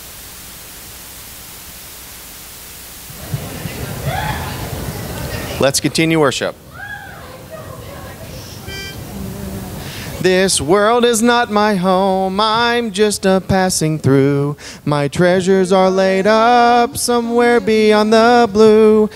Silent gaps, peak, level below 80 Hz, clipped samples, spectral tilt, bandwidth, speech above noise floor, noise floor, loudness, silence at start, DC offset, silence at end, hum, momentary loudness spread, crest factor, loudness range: none; 0 dBFS; -40 dBFS; under 0.1%; -4.5 dB/octave; 16 kHz; 21 dB; -34 dBFS; -14 LUFS; 0 s; under 0.1%; 0 s; none; 21 LU; 16 dB; 17 LU